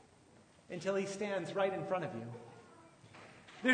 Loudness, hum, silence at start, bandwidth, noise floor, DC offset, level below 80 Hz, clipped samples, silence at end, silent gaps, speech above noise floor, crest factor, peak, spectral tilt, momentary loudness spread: -38 LUFS; none; 0.7 s; 9.6 kHz; -64 dBFS; under 0.1%; -82 dBFS; under 0.1%; 0 s; none; 26 dB; 22 dB; -18 dBFS; -5 dB/octave; 22 LU